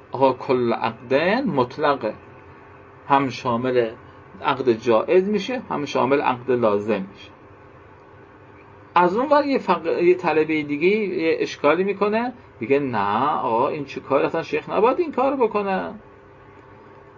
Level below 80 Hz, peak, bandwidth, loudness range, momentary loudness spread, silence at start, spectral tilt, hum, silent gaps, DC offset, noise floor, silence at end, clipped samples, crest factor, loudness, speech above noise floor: -58 dBFS; -2 dBFS; 7.2 kHz; 4 LU; 7 LU; 0.1 s; -6.5 dB/octave; none; none; under 0.1%; -46 dBFS; 0.2 s; under 0.1%; 20 dB; -21 LUFS; 26 dB